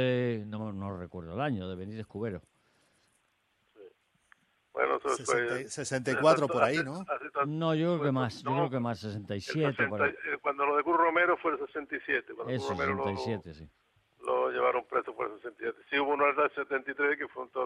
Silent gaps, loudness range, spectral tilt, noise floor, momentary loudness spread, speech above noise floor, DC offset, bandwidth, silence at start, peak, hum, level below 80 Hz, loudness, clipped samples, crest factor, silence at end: none; 10 LU; -5.5 dB/octave; -74 dBFS; 12 LU; 43 dB; under 0.1%; 12 kHz; 0 s; -10 dBFS; none; -70 dBFS; -31 LUFS; under 0.1%; 20 dB; 0 s